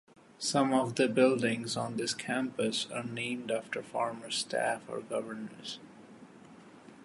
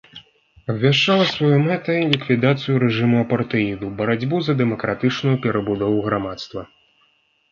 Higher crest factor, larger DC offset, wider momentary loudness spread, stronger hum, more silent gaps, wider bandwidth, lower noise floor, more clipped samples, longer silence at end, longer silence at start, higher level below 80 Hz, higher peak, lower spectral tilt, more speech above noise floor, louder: about the same, 20 dB vs 20 dB; neither; first, 13 LU vs 8 LU; neither; neither; first, 11.5 kHz vs 7.2 kHz; second, -54 dBFS vs -62 dBFS; neither; second, 0 s vs 0.85 s; first, 0.4 s vs 0.15 s; second, -76 dBFS vs -54 dBFS; second, -12 dBFS vs 0 dBFS; second, -4 dB/octave vs -7 dB/octave; second, 22 dB vs 43 dB; second, -32 LUFS vs -19 LUFS